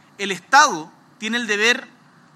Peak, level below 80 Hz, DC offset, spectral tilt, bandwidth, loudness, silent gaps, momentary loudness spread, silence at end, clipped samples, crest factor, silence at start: 0 dBFS; -86 dBFS; under 0.1%; -1.5 dB/octave; 14.5 kHz; -18 LUFS; none; 14 LU; 0.5 s; under 0.1%; 20 dB; 0.2 s